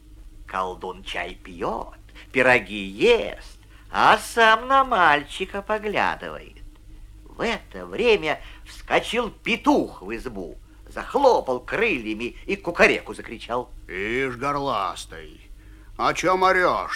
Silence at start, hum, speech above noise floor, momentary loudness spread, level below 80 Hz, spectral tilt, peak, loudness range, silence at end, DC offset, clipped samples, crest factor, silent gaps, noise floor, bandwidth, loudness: 0.1 s; none; 21 dB; 17 LU; -44 dBFS; -4 dB/octave; -4 dBFS; 6 LU; 0 s; under 0.1%; under 0.1%; 20 dB; none; -43 dBFS; 16 kHz; -22 LUFS